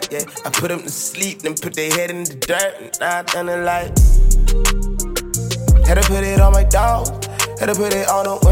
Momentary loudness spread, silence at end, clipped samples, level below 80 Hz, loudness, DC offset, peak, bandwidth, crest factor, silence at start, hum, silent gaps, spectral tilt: 9 LU; 0 s; under 0.1%; -18 dBFS; -18 LUFS; under 0.1%; 0 dBFS; 17 kHz; 14 dB; 0 s; none; none; -4 dB/octave